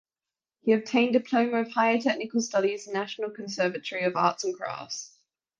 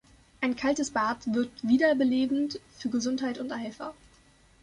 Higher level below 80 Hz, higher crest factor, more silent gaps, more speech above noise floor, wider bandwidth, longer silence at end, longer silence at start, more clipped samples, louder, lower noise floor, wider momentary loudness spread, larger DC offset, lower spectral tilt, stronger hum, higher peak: second, -76 dBFS vs -62 dBFS; about the same, 20 dB vs 18 dB; neither; first, over 63 dB vs 32 dB; second, 7.8 kHz vs 11 kHz; second, 0.55 s vs 0.7 s; first, 0.65 s vs 0.4 s; neither; about the same, -27 LUFS vs -28 LUFS; first, under -90 dBFS vs -60 dBFS; about the same, 11 LU vs 12 LU; neither; about the same, -4 dB/octave vs -4 dB/octave; neither; about the same, -8 dBFS vs -10 dBFS